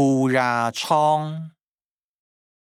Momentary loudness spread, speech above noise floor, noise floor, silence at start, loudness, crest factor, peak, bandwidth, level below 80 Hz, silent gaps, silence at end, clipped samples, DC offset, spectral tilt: 15 LU; over 70 dB; under -90 dBFS; 0 s; -21 LUFS; 18 dB; -6 dBFS; 15 kHz; -80 dBFS; none; 1.25 s; under 0.1%; under 0.1%; -5.5 dB/octave